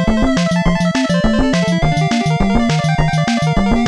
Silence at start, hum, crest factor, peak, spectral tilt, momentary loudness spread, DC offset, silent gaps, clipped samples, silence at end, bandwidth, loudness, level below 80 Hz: 0 s; none; 12 dB; -2 dBFS; -6 dB/octave; 1 LU; under 0.1%; none; under 0.1%; 0 s; 11 kHz; -15 LUFS; -24 dBFS